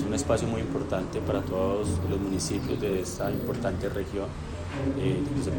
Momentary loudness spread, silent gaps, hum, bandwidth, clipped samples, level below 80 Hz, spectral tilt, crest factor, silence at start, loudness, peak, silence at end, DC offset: 5 LU; none; none; 17 kHz; under 0.1%; -44 dBFS; -6 dB/octave; 18 dB; 0 s; -29 LUFS; -10 dBFS; 0 s; under 0.1%